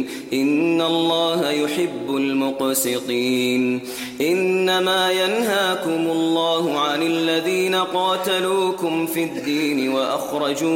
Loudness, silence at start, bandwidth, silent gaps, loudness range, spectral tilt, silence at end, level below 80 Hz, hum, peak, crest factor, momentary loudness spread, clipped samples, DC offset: -20 LUFS; 0 s; 16.5 kHz; none; 2 LU; -3.5 dB/octave; 0 s; -64 dBFS; none; -8 dBFS; 12 dB; 5 LU; under 0.1%; under 0.1%